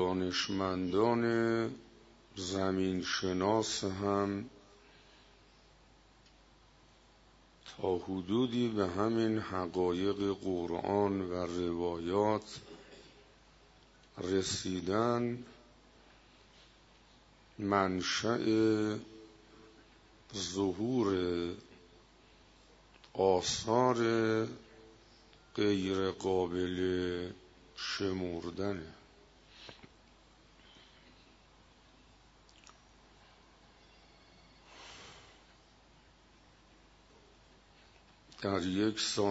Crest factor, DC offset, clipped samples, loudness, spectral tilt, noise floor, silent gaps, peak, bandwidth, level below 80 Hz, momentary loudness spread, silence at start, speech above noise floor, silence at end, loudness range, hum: 22 dB; under 0.1%; under 0.1%; -34 LUFS; -4.5 dB/octave; -63 dBFS; none; -14 dBFS; 7.6 kHz; -64 dBFS; 21 LU; 0 s; 30 dB; 0 s; 8 LU; none